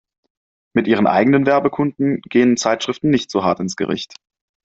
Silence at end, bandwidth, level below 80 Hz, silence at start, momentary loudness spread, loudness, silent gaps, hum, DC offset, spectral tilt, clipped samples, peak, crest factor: 0.6 s; 8 kHz; -58 dBFS; 0.75 s; 8 LU; -17 LUFS; none; none; under 0.1%; -5.5 dB/octave; under 0.1%; -2 dBFS; 16 dB